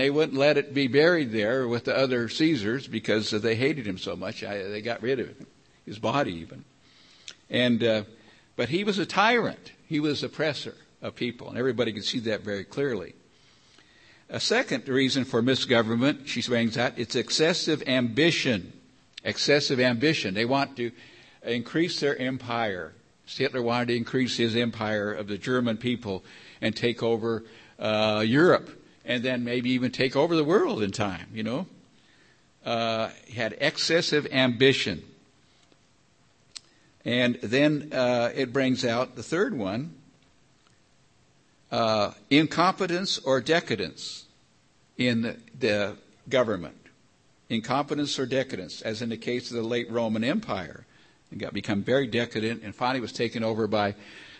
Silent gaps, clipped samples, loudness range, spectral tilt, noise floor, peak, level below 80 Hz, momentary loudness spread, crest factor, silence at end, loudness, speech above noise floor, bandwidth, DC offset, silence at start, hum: none; under 0.1%; 5 LU; -5 dB/octave; -63 dBFS; -6 dBFS; -64 dBFS; 12 LU; 20 dB; 0 s; -26 LUFS; 37 dB; 8.8 kHz; under 0.1%; 0 s; none